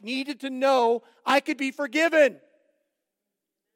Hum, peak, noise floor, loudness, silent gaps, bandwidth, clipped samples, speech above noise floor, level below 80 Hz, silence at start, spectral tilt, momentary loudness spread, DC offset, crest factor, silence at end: none; -8 dBFS; -84 dBFS; -24 LUFS; none; 16.5 kHz; under 0.1%; 61 dB; under -90 dBFS; 0.05 s; -2.5 dB/octave; 10 LU; under 0.1%; 18 dB; 1.4 s